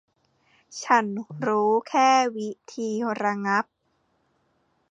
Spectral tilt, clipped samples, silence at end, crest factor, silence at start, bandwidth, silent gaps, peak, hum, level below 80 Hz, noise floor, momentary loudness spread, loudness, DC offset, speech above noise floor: -4 dB/octave; under 0.1%; 1.3 s; 20 dB; 0.7 s; 9.4 kHz; none; -6 dBFS; none; -76 dBFS; -70 dBFS; 15 LU; -24 LUFS; under 0.1%; 46 dB